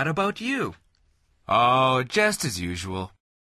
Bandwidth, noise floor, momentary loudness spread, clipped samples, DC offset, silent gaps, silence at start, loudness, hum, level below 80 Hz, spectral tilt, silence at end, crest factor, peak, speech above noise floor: 13.5 kHz; -65 dBFS; 13 LU; under 0.1%; under 0.1%; none; 0 s; -24 LUFS; none; -50 dBFS; -4 dB/octave; 0.4 s; 18 dB; -8 dBFS; 41 dB